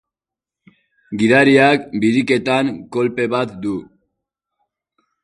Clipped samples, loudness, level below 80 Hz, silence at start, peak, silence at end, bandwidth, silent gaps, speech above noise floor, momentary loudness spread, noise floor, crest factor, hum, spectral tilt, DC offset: under 0.1%; -16 LUFS; -58 dBFS; 1.1 s; 0 dBFS; 1.4 s; 11 kHz; none; 72 dB; 14 LU; -88 dBFS; 18 dB; none; -6 dB/octave; under 0.1%